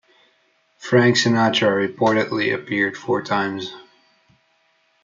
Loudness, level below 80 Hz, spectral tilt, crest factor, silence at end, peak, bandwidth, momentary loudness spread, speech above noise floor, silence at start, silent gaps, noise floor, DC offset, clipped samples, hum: -19 LUFS; -68 dBFS; -5 dB/octave; 18 dB; 1.2 s; -4 dBFS; 7.6 kHz; 10 LU; 44 dB; 0.8 s; none; -63 dBFS; under 0.1%; under 0.1%; none